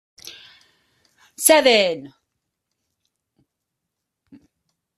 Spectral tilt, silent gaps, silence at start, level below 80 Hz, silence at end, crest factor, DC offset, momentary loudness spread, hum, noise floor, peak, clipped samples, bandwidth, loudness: -1 dB/octave; none; 0.25 s; -68 dBFS; 2.9 s; 24 dB; under 0.1%; 26 LU; none; -81 dBFS; 0 dBFS; under 0.1%; 15 kHz; -16 LUFS